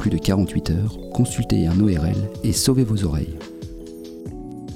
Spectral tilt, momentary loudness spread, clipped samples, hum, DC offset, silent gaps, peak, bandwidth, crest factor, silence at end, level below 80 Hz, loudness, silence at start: -6 dB/octave; 17 LU; under 0.1%; none; under 0.1%; none; -6 dBFS; 16.5 kHz; 16 dB; 0 s; -36 dBFS; -21 LUFS; 0 s